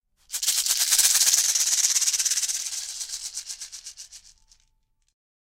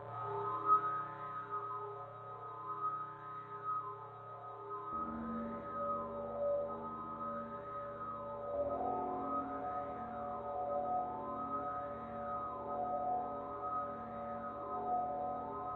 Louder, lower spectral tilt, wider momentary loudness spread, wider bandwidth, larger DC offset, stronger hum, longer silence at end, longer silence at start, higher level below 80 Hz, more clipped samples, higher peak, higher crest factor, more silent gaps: first, -20 LUFS vs -41 LUFS; second, 5.5 dB/octave vs -6.5 dB/octave; first, 19 LU vs 8 LU; first, 17 kHz vs 4.4 kHz; neither; neither; first, 1.3 s vs 0 s; first, 0.3 s vs 0 s; about the same, -64 dBFS vs -66 dBFS; neither; first, -2 dBFS vs -20 dBFS; about the same, 24 dB vs 20 dB; neither